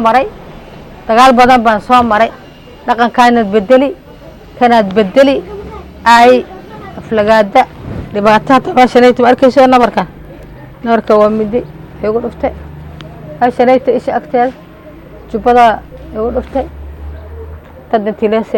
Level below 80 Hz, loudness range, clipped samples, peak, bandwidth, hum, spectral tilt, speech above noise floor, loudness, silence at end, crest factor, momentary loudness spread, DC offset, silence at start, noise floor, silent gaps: -34 dBFS; 6 LU; 0.3%; 0 dBFS; 17 kHz; none; -5.5 dB/octave; 24 dB; -10 LUFS; 0 s; 10 dB; 22 LU; under 0.1%; 0 s; -33 dBFS; none